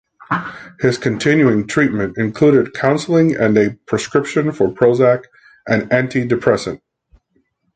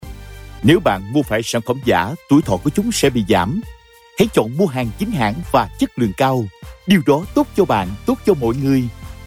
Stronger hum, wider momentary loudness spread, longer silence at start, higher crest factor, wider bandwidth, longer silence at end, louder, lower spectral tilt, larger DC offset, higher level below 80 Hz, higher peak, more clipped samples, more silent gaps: neither; about the same, 9 LU vs 8 LU; first, 0.3 s vs 0 s; about the same, 14 dB vs 14 dB; second, 9.4 kHz vs 16.5 kHz; first, 1 s vs 0 s; about the same, -16 LUFS vs -17 LUFS; about the same, -6.5 dB/octave vs -6 dB/octave; neither; second, -50 dBFS vs -38 dBFS; about the same, -2 dBFS vs -2 dBFS; neither; neither